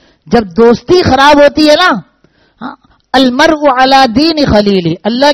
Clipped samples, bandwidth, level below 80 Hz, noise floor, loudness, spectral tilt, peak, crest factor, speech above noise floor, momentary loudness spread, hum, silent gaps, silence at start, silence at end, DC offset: 2%; 15.5 kHz; -34 dBFS; -50 dBFS; -7 LUFS; -5 dB/octave; 0 dBFS; 8 dB; 43 dB; 10 LU; none; none; 0.25 s; 0 s; under 0.1%